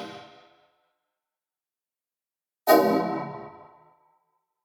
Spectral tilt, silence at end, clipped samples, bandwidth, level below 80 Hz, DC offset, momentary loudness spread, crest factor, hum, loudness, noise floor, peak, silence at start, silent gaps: -5 dB/octave; 1.15 s; under 0.1%; 19.5 kHz; -76 dBFS; under 0.1%; 25 LU; 26 dB; none; -23 LUFS; under -90 dBFS; -4 dBFS; 0 s; none